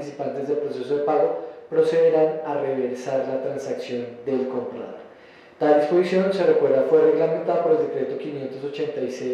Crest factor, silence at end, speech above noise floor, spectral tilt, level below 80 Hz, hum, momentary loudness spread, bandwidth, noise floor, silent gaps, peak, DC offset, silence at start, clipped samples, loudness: 16 dB; 0 s; 26 dB; -7 dB/octave; -74 dBFS; none; 12 LU; 9.2 kHz; -48 dBFS; none; -6 dBFS; under 0.1%; 0 s; under 0.1%; -22 LUFS